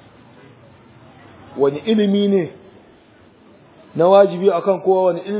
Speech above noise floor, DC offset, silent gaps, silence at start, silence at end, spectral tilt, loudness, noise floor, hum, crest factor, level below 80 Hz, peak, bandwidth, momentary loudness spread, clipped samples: 33 dB; under 0.1%; none; 1.55 s; 0 s; -11 dB/octave; -16 LUFS; -49 dBFS; none; 18 dB; -62 dBFS; 0 dBFS; 4 kHz; 12 LU; under 0.1%